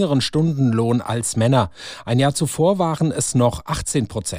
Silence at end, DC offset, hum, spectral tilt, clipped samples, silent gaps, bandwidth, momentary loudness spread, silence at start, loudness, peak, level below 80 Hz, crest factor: 0 s; under 0.1%; none; -5.5 dB/octave; under 0.1%; none; 15.5 kHz; 4 LU; 0 s; -19 LUFS; -4 dBFS; -44 dBFS; 14 dB